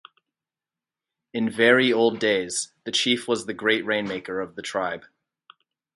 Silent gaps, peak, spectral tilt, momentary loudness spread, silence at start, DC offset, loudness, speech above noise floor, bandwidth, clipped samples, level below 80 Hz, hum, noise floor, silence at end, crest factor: none; -4 dBFS; -3 dB/octave; 13 LU; 1.35 s; under 0.1%; -23 LUFS; over 67 dB; 11.5 kHz; under 0.1%; -68 dBFS; none; under -90 dBFS; 0.95 s; 20 dB